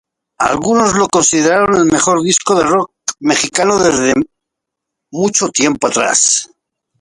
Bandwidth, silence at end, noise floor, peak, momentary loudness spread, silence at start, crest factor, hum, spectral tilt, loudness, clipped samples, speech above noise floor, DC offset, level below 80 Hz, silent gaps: 11.5 kHz; 0.55 s; -79 dBFS; 0 dBFS; 7 LU; 0.4 s; 14 dB; none; -3 dB/octave; -12 LUFS; under 0.1%; 67 dB; under 0.1%; -48 dBFS; none